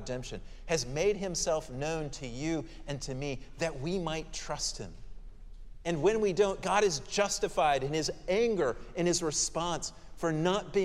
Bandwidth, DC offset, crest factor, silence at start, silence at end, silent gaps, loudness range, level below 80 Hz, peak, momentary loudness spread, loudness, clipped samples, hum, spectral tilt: 14 kHz; under 0.1%; 18 dB; 0 s; 0 s; none; 7 LU; -48 dBFS; -14 dBFS; 11 LU; -32 LUFS; under 0.1%; none; -4 dB/octave